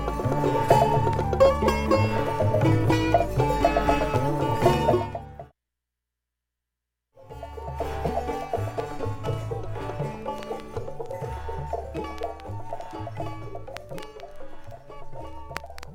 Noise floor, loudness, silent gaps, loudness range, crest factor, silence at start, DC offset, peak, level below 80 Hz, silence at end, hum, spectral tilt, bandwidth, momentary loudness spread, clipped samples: -85 dBFS; -25 LUFS; none; 15 LU; 22 dB; 0 s; under 0.1%; -4 dBFS; -38 dBFS; 0 s; 60 Hz at -55 dBFS; -7 dB/octave; 17 kHz; 20 LU; under 0.1%